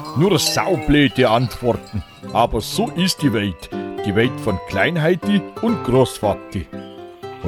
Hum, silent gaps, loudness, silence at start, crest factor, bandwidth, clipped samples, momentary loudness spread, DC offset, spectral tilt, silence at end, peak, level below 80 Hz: none; none; -18 LUFS; 0 s; 16 dB; 17 kHz; under 0.1%; 14 LU; under 0.1%; -5 dB/octave; 0 s; -4 dBFS; -38 dBFS